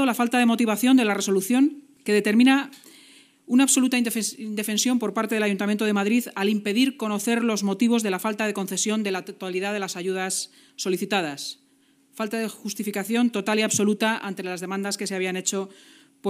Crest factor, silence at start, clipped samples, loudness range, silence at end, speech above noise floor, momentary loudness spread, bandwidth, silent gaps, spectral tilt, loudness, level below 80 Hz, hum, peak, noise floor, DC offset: 16 dB; 0 s; under 0.1%; 6 LU; 0 s; 38 dB; 11 LU; 15.5 kHz; none; -3.5 dB/octave; -23 LUFS; -80 dBFS; none; -8 dBFS; -61 dBFS; under 0.1%